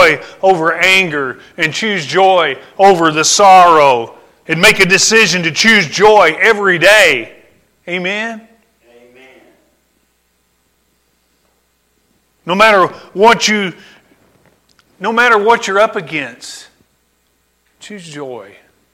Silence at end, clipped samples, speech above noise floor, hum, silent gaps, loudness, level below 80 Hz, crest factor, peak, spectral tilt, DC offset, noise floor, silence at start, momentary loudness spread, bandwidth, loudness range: 0.5 s; under 0.1%; 49 dB; none; none; -10 LUFS; -50 dBFS; 12 dB; 0 dBFS; -2.5 dB/octave; under 0.1%; -60 dBFS; 0 s; 20 LU; 17 kHz; 13 LU